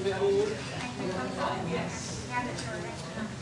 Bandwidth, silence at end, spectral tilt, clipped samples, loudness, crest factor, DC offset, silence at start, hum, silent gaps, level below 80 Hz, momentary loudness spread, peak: 11.5 kHz; 0 s; -5 dB/octave; under 0.1%; -32 LUFS; 14 dB; under 0.1%; 0 s; none; none; -56 dBFS; 10 LU; -18 dBFS